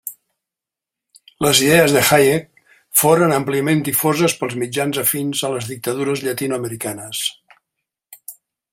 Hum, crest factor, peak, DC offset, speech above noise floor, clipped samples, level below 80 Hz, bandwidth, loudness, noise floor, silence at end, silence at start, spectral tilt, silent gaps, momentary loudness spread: none; 18 dB; 0 dBFS; under 0.1%; 69 dB; under 0.1%; -56 dBFS; 16.5 kHz; -17 LUFS; -86 dBFS; 0.4 s; 0.05 s; -3.5 dB/octave; none; 13 LU